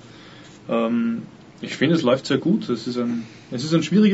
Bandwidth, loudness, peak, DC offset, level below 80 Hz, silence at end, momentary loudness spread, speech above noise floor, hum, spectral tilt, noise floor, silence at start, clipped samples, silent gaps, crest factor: 8 kHz; -22 LUFS; -6 dBFS; under 0.1%; -66 dBFS; 0 s; 19 LU; 23 dB; none; -6.5 dB/octave; -44 dBFS; 0.05 s; under 0.1%; none; 16 dB